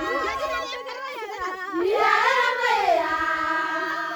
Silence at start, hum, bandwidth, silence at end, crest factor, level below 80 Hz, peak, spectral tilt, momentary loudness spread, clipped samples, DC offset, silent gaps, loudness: 0 s; none; over 20 kHz; 0 s; 18 dB; -56 dBFS; -6 dBFS; -2.5 dB/octave; 13 LU; under 0.1%; under 0.1%; none; -23 LUFS